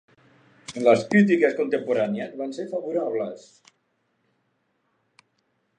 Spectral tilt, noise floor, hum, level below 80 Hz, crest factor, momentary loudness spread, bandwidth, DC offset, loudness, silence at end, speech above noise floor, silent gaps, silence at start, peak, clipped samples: -6.5 dB/octave; -72 dBFS; none; -74 dBFS; 20 dB; 16 LU; 9.6 kHz; under 0.1%; -23 LUFS; 2.4 s; 49 dB; none; 0.7 s; -4 dBFS; under 0.1%